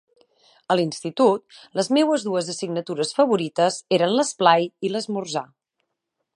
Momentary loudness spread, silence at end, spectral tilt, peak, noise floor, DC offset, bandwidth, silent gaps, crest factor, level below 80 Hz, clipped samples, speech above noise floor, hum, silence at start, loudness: 9 LU; 0.9 s; -4.5 dB/octave; -2 dBFS; -79 dBFS; under 0.1%; 11.5 kHz; none; 22 dB; -74 dBFS; under 0.1%; 58 dB; none; 0.7 s; -22 LUFS